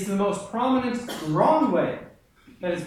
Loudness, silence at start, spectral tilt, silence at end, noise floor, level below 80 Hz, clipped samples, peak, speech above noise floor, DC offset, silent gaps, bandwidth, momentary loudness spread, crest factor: -24 LUFS; 0 s; -6 dB/octave; 0 s; -53 dBFS; -58 dBFS; under 0.1%; -8 dBFS; 29 dB; under 0.1%; none; 15.5 kHz; 10 LU; 16 dB